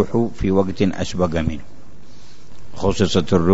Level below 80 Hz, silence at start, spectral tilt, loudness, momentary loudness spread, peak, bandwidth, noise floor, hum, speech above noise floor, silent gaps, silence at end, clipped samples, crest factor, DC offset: -36 dBFS; 0 s; -6.5 dB/octave; -20 LUFS; 7 LU; -2 dBFS; 8 kHz; -46 dBFS; none; 28 dB; none; 0 s; under 0.1%; 18 dB; 5%